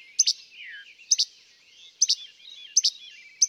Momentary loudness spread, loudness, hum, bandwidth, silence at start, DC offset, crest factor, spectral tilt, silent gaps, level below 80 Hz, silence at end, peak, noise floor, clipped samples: 21 LU; -23 LUFS; none; 16.5 kHz; 0.2 s; under 0.1%; 20 dB; 7.5 dB/octave; none; under -90 dBFS; 0 s; -8 dBFS; -55 dBFS; under 0.1%